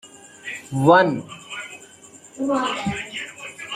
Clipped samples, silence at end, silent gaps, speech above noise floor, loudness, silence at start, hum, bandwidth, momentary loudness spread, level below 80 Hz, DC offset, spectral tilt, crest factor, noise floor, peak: under 0.1%; 0 s; none; 28 dB; -21 LUFS; 0.05 s; none; 15 kHz; 21 LU; -58 dBFS; under 0.1%; -5 dB/octave; 22 dB; -46 dBFS; -2 dBFS